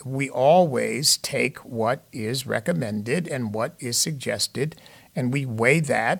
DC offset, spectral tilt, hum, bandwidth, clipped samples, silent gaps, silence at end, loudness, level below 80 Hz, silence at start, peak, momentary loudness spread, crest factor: under 0.1%; -4 dB/octave; none; 19 kHz; under 0.1%; none; 0 s; -23 LUFS; -64 dBFS; 0 s; -4 dBFS; 10 LU; 20 dB